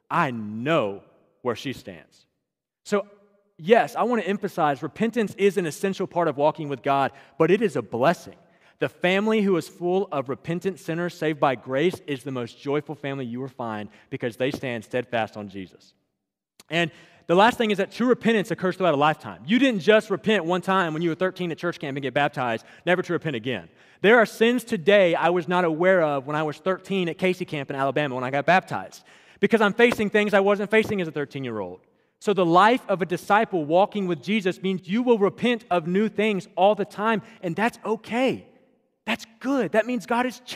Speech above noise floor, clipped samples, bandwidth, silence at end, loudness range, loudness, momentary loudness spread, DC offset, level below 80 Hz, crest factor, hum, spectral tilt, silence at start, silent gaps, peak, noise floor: 59 dB; under 0.1%; 15.5 kHz; 0 s; 7 LU; -23 LUFS; 12 LU; under 0.1%; -68 dBFS; 22 dB; none; -6 dB/octave; 0.1 s; none; -2 dBFS; -82 dBFS